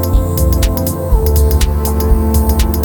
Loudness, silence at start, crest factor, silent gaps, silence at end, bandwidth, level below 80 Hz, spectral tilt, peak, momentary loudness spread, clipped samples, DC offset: -14 LUFS; 0 s; 12 dB; none; 0 s; 19.5 kHz; -14 dBFS; -6 dB/octave; 0 dBFS; 3 LU; under 0.1%; under 0.1%